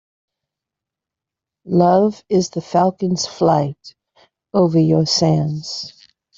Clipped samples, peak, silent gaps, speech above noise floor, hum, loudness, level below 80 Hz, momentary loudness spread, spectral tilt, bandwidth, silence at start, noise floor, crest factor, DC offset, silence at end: under 0.1%; 0 dBFS; none; 69 dB; none; -17 LUFS; -56 dBFS; 11 LU; -6 dB/octave; 7.8 kHz; 1.65 s; -86 dBFS; 18 dB; under 0.1%; 0.45 s